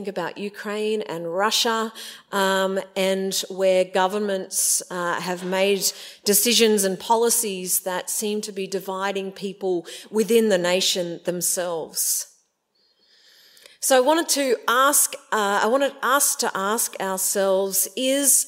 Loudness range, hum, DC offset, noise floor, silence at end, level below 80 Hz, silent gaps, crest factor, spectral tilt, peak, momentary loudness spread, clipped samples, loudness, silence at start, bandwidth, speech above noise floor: 4 LU; none; under 0.1%; -67 dBFS; 0 s; -78 dBFS; none; 20 dB; -2 dB/octave; -2 dBFS; 10 LU; under 0.1%; -21 LUFS; 0 s; 16.5 kHz; 45 dB